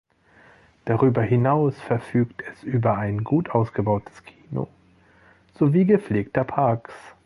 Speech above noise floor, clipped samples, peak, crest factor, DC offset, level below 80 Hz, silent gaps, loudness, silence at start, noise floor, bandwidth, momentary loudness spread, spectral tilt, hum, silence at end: 34 dB; under 0.1%; -4 dBFS; 18 dB; under 0.1%; -54 dBFS; none; -23 LUFS; 0.85 s; -56 dBFS; 11 kHz; 12 LU; -10 dB/octave; none; 0.15 s